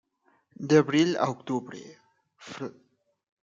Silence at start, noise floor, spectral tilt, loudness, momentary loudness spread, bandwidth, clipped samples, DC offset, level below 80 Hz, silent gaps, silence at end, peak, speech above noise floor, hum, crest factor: 0.6 s; -68 dBFS; -6 dB/octave; -25 LUFS; 22 LU; 7.8 kHz; under 0.1%; under 0.1%; -74 dBFS; none; 0.75 s; -8 dBFS; 42 dB; none; 22 dB